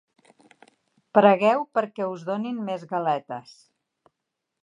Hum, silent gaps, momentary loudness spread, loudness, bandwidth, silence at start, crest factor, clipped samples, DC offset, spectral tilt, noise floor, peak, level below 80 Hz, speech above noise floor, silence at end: none; none; 13 LU; -23 LUFS; 10 kHz; 1.15 s; 22 dB; under 0.1%; under 0.1%; -7 dB/octave; -83 dBFS; -2 dBFS; -82 dBFS; 59 dB; 1.25 s